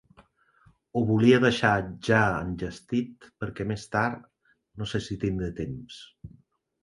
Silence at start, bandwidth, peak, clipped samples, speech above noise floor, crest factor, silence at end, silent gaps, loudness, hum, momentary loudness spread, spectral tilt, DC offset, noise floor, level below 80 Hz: 0.95 s; 11 kHz; -6 dBFS; under 0.1%; 36 dB; 22 dB; 0.55 s; none; -26 LUFS; none; 19 LU; -6.5 dB/octave; under 0.1%; -62 dBFS; -50 dBFS